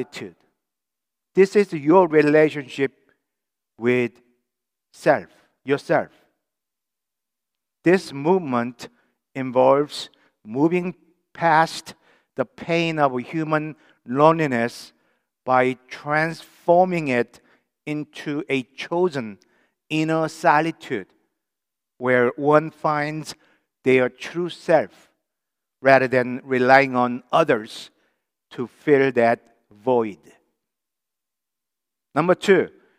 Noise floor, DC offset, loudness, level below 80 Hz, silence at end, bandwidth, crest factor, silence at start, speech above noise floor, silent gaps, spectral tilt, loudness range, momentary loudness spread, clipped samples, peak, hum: -86 dBFS; under 0.1%; -21 LUFS; -74 dBFS; 0.3 s; 13.5 kHz; 22 dB; 0 s; 66 dB; none; -6 dB/octave; 6 LU; 16 LU; under 0.1%; 0 dBFS; none